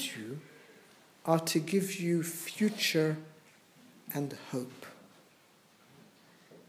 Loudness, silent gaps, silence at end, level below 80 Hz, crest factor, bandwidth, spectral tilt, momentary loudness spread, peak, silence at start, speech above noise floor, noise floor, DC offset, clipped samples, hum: -33 LUFS; none; 0.1 s; -86 dBFS; 24 dB; 16 kHz; -4.5 dB/octave; 22 LU; -12 dBFS; 0 s; 31 dB; -63 dBFS; under 0.1%; under 0.1%; none